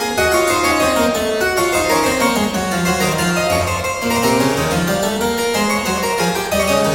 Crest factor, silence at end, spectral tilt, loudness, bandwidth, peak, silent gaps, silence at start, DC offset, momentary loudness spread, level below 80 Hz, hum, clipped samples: 14 dB; 0 s; -3.5 dB/octave; -16 LUFS; 17 kHz; -2 dBFS; none; 0 s; under 0.1%; 3 LU; -38 dBFS; none; under 0.1%